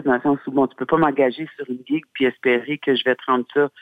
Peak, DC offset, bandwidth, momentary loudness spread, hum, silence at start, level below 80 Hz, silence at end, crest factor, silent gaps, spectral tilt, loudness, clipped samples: -4 dBFS; under 0.1%; 5 kHz; 7 LU; none; 0 s; -60 dBFS; 0.15 s; 16 dB; none; -7.5 dB/octave; -20 LUFS; under 0.1%